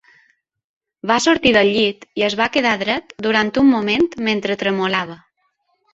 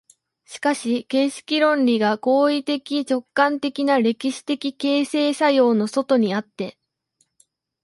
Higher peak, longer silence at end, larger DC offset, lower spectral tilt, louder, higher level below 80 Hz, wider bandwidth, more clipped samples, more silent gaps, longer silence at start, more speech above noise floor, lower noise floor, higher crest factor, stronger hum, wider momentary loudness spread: about the same, -2 dBFS vs -4 dBFS; second, 0.8 s vs 1.15 s; neither; about the same, -4 dB/octave vs -4.5 dB/octave; first, -17 LUFS vs -20 LUFS; first, -52 dBFS vs -72 dBFS; second, 8 kHz vs 11.5 kHz; neither; neither; first, 1.05 s vs 0.5 s; about the same, 50 dB vs 48 dB; about the same, -67 dBFS vs -68 dBFS; about the same, 18 dB vs 16 dB; neither; about the same, 8 LU vs 8 LU